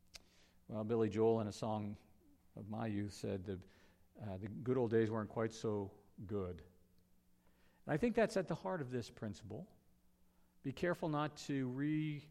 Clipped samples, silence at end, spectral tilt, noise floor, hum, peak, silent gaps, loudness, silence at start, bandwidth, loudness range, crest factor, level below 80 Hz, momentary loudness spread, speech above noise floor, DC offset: under 0.1%; 0 s; -7 dB/octave; -71 dBFS; none; -22 dBFS; none; -41 LUFS; 0.15 s; 14 kHz; 3 LU; 20 dB; -70 dBFS; 17 LU; 31 dB; under 0.1%